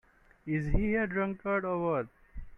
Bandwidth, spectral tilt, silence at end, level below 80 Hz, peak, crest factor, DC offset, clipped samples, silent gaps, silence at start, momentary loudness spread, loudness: 6.6 kHz; -9.5 dB/octave; 0 s; -40 dBFS; -10 dBFS; 20 dB; under 0.1%; under 0.1%; none; 0.45 s; 14 LU; -32 LUFS